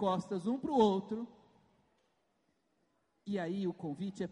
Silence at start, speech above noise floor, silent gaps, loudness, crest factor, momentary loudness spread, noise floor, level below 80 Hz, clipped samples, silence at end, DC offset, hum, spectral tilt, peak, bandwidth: 0 s; 44 dB; none; -35 LUFS; 20 dB; 13 LU; -78 dBFS; -74 dBFS; under 0.1%; 0 s; under 0.1%; none; -7 dB/octave; -18 dBFS; 10.5 kHz